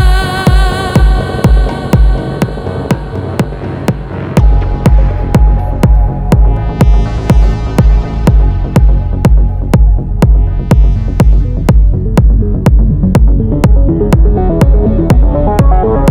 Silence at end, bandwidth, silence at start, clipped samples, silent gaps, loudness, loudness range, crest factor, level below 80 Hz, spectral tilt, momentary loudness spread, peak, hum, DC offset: 0 s; 11.5 kHz; 0 s; under 0.1%; none; -11 LUFS; 4 LU; 8 dB; -10 dBFS; -7.5 dB/octave; 6 LU; 0 dBFS; none; under 0.1%